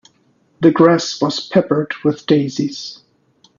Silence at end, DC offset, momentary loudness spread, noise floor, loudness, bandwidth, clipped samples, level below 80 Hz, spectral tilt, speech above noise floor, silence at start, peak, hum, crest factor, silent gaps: 0.65 s; under 0.1%; 11 LU; -58 dBFS; -16 LUFS; 7.4 kHz; under 0.1%; -58 dBFS; -6 dB/octave; 43 dB; 0.6 s; 0 dBFS; none; 16 dB; none